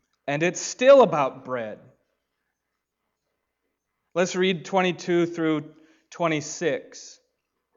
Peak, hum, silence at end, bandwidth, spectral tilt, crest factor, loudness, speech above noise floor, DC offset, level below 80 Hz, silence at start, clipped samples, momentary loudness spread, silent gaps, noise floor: -6 dBFS; none; 0.65 s; 7.8 kHz; -4.5 dB/octave; 20 dB; -23 LUFS; 58 dB; under 0.1%; -76 dBFS; 0.25 s; under 0.1%; 16 LU; none; -81 dBFS